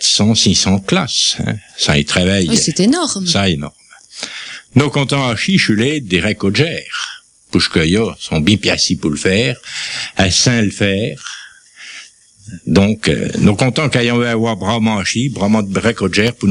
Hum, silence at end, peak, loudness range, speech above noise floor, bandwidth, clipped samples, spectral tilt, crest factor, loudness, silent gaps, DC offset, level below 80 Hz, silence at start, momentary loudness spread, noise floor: none; 0 s; 0 dBFS; 3 LU; 26 dB; 11.5 kHz; under 0.1%; -4 dB/octave; 14 dB; -14 LUFS; none; under 0.1%; -40 dBFS; 0 s; 12 LU; -40 dBFS